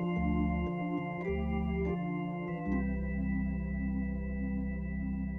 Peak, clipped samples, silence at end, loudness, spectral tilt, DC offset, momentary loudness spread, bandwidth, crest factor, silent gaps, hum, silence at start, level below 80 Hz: -20 dBFS; under 0.1%; 0 s; -35 LUFS; -10.5 dB/octave; under 0.1%; 5 LU; 3 kHz; 12 dB; none; none; 0 s; -40 dBFS